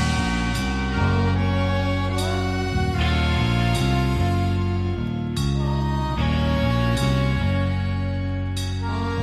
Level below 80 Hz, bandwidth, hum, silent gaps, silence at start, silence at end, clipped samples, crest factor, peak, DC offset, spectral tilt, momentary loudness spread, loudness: -30 dBFS; 13.5 kHz; none; none; 0 s; 0 s; under 0.1%; 12 dB; -10 dBFS; under 0.1%; -6 dB/octave; 5 LU; -23 LUFS